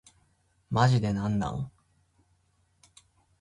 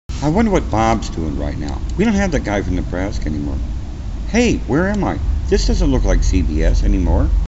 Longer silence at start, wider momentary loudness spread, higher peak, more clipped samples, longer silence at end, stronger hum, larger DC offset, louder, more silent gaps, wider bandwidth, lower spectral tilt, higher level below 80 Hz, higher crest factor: first, 0.7 s vs 0.1 s; first, 13 LU vs 8 LU; second, -8 dBFS vs 0 dBFS; neither; first, 1.7 s vs 0.05 s; neither; neither; second, -28 LUFS vs -18 LUFS; neither; first, 11 kHz vs 8 kHz; about the same, -7 dB/octave vs -6.5 dB/octave; second, -54 dBFS vs -20 dBFS; first, 22 dB vs 16 dB